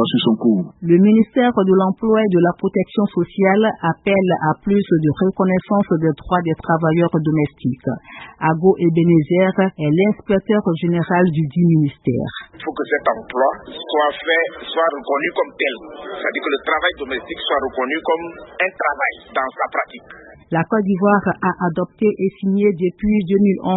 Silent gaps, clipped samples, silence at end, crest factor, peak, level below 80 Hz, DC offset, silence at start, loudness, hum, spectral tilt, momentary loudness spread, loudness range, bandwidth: none; under 0.1%; 0 s; 16 dB; -2 dBFS; -50 dBFS; under 0.1%; 0 s; -18 LUFS; none; -12 dB/octave; 8 LU; 5 LU; 4.1 kHz